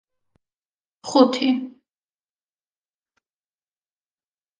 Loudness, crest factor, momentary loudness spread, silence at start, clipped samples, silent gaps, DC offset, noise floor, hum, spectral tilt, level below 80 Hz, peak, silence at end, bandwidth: -19 LUFS; 26 dB; 21 LU; 1.05 s; under 0.1%; none; under 0.1%; under -90 dBFS; none; -4 dB/octave; -76 dBFS; 0 dBFS; 2.9 s; 9.6 kHz